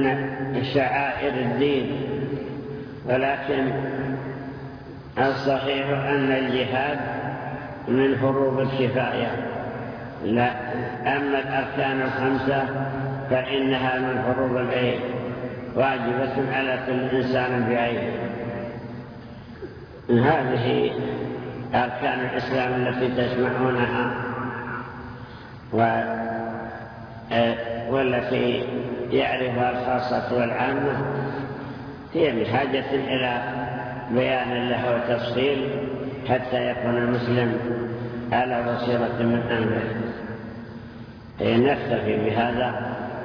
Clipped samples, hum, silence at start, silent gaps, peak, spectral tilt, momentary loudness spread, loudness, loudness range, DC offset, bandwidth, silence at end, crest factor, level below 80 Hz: under 0.1%; none; 0 s; none; -8 dBFS; -8.5 dB/octave; 12 LU; -24 LUFS; 2 LU; under 0.1%; 5.4 kHz; 0 s; 18 dB; -52 dBFS